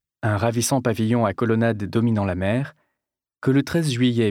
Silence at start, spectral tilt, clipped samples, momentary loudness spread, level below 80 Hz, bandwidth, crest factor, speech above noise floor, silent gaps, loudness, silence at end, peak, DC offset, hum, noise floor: 0.25 s; -6 dB/octave; under 0.1%; 4 LU; -54 dBFS; 16.5 kHz; 16 dB; 64 dB; none; -22 LUFS; 0 s; -6 dBFS; under 0.1%; none; -84 dBFS